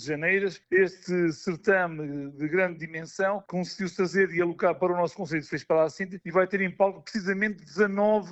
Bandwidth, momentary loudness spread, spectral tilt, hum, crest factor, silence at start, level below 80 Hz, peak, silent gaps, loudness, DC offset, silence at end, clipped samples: 8.2 kHz; 8 LU; -6 dB/octave; none; 18 dB; 0 s; -68 dBFS; -10 dBFS; none; -27 LUFS; under 0.1%; 0 s; under 0.1%